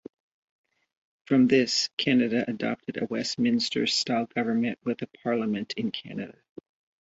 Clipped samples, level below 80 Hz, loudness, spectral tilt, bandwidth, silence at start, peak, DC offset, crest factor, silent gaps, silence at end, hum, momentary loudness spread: under 0.1%; -68 dBFS; -26 LUFS; -4 dB/octave; 8 kHz; 1.3 s; -8 dBFS; under 0.1%; 20 dB; 1.93-1.97 s; 0.7 s; none; 10 LU